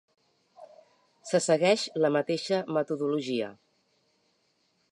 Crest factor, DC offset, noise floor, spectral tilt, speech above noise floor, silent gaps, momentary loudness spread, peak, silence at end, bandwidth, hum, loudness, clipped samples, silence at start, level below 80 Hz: 20 dB; under 0.1%; -72 dBFS; -4.5 dB/octave; 45 dB; none; 9 LU; -10 dBFS; 1.4 s; 11 kHz; none; -28 LUFS; under 0.1%; 0.6 s; -82 dBFS